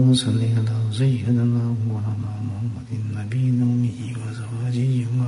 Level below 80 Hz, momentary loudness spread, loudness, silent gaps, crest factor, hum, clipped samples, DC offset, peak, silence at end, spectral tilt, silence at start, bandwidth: -54 dBFS; 9 LU; -23 LUFS; none; 14 dB; none; under 0.1%; under 0.1%; -8 dBFS; 0 s; -7 dB/octave; 0 s; 11 kHz